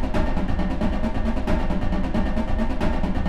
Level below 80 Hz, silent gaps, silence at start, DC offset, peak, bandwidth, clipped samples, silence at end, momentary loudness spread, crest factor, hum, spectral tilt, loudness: -24 dBFS; none; 0 s; under 0.1%; -8 dBFS; 7.6 kHz; under 0.1%; 0 s; 1 LU; 12 dB; none; -7.5 dB/octave; -26 LUFS